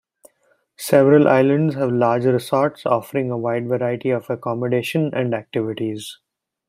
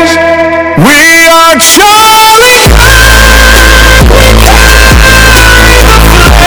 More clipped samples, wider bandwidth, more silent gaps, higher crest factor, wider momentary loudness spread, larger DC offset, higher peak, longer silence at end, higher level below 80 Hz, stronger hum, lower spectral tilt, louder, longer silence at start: second, under 0.1% vs 70%; second, 16 kHz vs over 20 kHz; neither; first, 18 dB vs 2 dB; first, 12 LU vs 3 LU; neither; about the same, -2 dBFS vs 0 dBFS; first, 0.55 s vs 0 s; second, -64 dBFS vs -6 dBFS; neither; first, -7 dB/octave vs -3 dB/octave; second, -19 LUFS vs -1 LUFS; first, 0.8 s vs 0 s